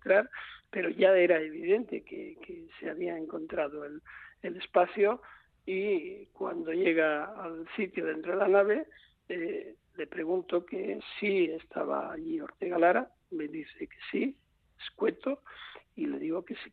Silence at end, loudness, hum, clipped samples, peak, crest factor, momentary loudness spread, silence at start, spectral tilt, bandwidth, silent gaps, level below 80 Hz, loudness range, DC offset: 0.05 s; -31 LUFS; none; under 0.1%; -12 dBFS; 20 dB; 18 LU; 0.05 s; -8.5 dB/octave; 4.6 kHz; none; -72 dBFS; 5 LU; under 0.1%